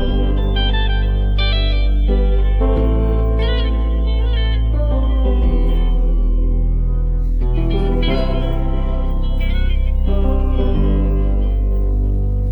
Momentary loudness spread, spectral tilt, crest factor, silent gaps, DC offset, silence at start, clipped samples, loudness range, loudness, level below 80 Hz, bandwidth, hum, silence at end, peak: 4 LU; -9 dB/octave; 10 dB; none; under 0.1%; 0 s; under 0.1%; 2 LU; -19 LUFS; -14 dBFS; 5 kHz; none; 0 s; -4 dBFS